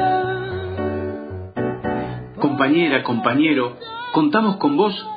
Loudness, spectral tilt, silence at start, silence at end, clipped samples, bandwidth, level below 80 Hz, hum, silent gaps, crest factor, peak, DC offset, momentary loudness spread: -20 LUFS; -10 dB/octave; 0 s; 0 s; under 0.1%; 5 kHz; -52 dBFS; none; none; 18 dB; -2 dBFS; under 0.1%; 11 LU